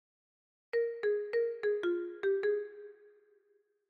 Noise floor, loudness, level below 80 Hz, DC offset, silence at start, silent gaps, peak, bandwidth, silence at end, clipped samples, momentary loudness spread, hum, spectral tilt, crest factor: -73 dBFS; -34 LUFS; -88 dBFS; under 0.1%; 0.75 s; none; -24 dBFS; 4.9 kHz; 0.95 s; under 0.1%; 11 LU; none; -5 dB/octave; 12 dB